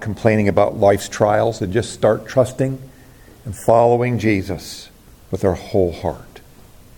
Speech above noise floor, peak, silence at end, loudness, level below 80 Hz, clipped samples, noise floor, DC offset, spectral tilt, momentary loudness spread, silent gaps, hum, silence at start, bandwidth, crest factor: 27 dB; 0 dBFS; 0.6 s; -18 LUFS; -46 dBFS; under 0.1%; -44 dBFS; under 0.1%; -6.5 dB/octave; 16 LU; none; none; 0 s; 17.5 kHz; 18 dB